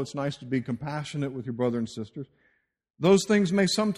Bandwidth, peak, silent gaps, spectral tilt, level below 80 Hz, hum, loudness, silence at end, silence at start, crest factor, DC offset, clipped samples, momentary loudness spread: 13.5 kHz; -10 dBFS; none; -5.5 dB/octave; -62 dBFS; none; -27 LUFS; 0 s; 0 s; 18 dB; under 0.1%; under 0.1%; 16 LU